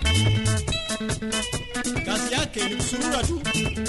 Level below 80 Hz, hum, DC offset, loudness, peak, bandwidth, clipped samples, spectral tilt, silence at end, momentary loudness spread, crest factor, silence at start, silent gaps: -34 dBFS; none; under 0.1%; -25 LUFS; -10 dBFS; 12 kHz; under 0.1%; -4 dB/octave; 0 s; 6 LU; 16 dB; 0 s; none